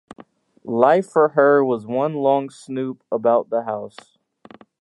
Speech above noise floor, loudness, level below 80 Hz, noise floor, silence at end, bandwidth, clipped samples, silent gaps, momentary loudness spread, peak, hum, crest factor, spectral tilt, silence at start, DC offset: 29 dB; -19 LUFS; -74 dBFS; -48 dBFS; 0.95 s; 11.5 kHz; under 0.1%; none; 14 LU; 0 dBFS; none; 20 dB; -7 dB/octave; 0.65 s; under 0.1%